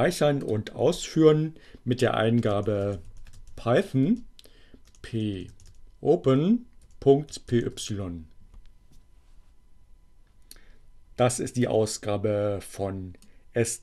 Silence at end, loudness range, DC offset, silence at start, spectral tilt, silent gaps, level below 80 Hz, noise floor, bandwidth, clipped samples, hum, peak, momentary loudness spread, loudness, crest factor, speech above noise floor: 0.05 s; 9 LU; under 0.1%; 0 s; -6 dB/octave; none; -50 dBFS; -53 dBFS; 13 kHz; under 0.1%; none; -6 dBFS; 14 LU; -26 LUFS; 20 dB; 28 dB